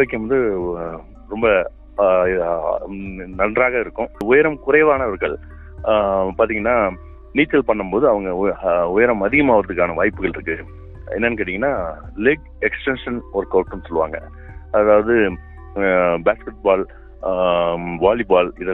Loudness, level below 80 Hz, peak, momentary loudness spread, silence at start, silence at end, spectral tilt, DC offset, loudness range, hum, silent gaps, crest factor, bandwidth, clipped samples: -18 LUFS; -38 dBFS; -2 dBFS; 13 LU; 0 s; 0 s; -8.5 dB/octave; under 0.1%; 4 LU; none; none; 18 dB; 4.1 kHz; under 0.1%